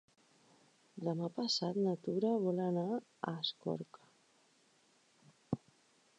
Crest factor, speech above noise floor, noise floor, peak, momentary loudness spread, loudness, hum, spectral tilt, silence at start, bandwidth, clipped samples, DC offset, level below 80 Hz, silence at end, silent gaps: 20 dB; 34 dB; -71 dBFS; -20 dBFS; 10 LU; -38 LUFS; none; -6 dB/octave; 0.95 s; 9.8 kHz; under 0.1%; under 0.1%; -78 dBFS; 0.6 s; none